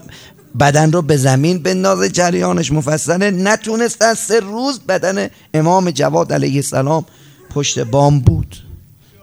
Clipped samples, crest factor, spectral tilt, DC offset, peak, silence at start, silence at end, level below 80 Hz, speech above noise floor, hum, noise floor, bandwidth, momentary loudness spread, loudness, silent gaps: 0.1%; 14 dB; -5 dB/octave; under 0.1%; 0 dBFS; 0.1 s; 0.45 s; -38 dBFS; 26 dB; none; -39 dBFS; over 20 kHz; 8 LU; -14 LUFS; none